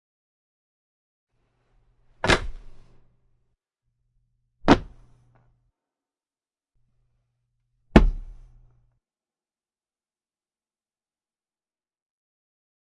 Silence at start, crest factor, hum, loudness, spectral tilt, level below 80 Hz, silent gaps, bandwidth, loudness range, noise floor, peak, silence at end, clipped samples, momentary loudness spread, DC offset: 2.25 s; 30 dB; none; -22 LUFS; -5.5 dB/octave; -36 dBFS; none; 11 kHz; 4 LU; under -90 dBFS; 0 dBFS; 4.6 s; under 0.1%; 15 LU; under 0.1%